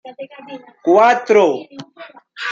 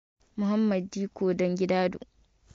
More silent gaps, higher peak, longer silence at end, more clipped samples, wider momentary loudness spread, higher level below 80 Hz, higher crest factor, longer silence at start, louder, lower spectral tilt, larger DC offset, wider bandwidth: neither; first, 0 dBFS vs -14 dBFS; second, 0 s vs 0.6 s; neither; first, 24 LU vs 9 LU; about the same, -68 dBFS vs -64 dBFS; about the same, 16 dB vs 14 dB; second, 0.05 s vs 0.35 s; first, -14 LUFS vs -28 LUFS; second, -4.5 dB/octave vs -7 dB/octave; neither; about the same, 7.6 kHz vs 7.6 kHz